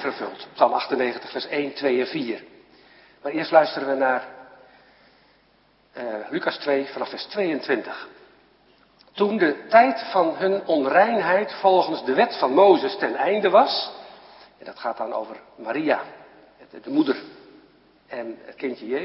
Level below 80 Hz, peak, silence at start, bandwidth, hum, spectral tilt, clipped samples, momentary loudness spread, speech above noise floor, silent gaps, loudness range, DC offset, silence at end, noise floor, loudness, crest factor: -72 dBFS; -2 dBFS; 0 s; 5.8 kHz; none; -9 dB/octave; under 0.1%; 18 LU; 38 dB; none; 9 LU; under 0.1%; 0 s; -60 dBFS; -22 LUFS; 22 dB